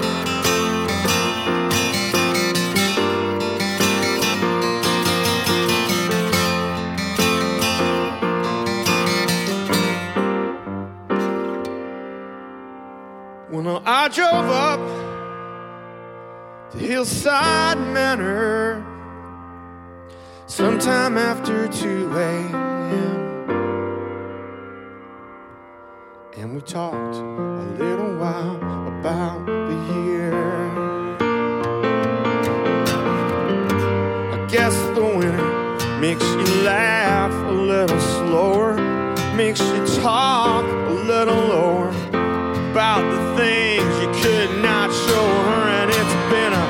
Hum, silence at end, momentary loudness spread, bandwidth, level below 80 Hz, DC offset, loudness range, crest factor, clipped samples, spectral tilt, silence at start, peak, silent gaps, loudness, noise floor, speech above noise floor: none; 0 s; 16 LU; 17 kHz; -50 dBFS; under 0.1%; 8 LU; 16 dB; under 0.1%; -4.5 dB/octave; 0 s; -4 dBFS; none; -20 LUFS; -42 dBFS; 23 dB